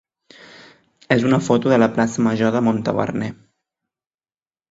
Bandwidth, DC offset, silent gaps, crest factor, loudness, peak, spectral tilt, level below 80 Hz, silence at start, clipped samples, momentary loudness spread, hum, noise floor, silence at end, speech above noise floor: 8 kHz; under 0.1%; none; 18 dB; -18 LUFS; -2 dBFS; -6.5 dB/octave; -58 dBFS; 1.1 s; under 0.1%; 7 LU; none; under -90 dBFS; 1.35 s; over 73 dB